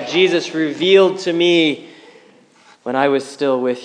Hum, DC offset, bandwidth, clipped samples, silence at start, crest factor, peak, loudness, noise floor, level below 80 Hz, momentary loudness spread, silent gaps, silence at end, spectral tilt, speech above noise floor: none; under 0.1%; 10 kHz; under 0.1%; 0 s; 16 dB; 0 dBFS; -16 LUFS; -49 dBFS; -78 dBFS; 9 LU; none; 0 s; -4.5 dB/octave; 34 dB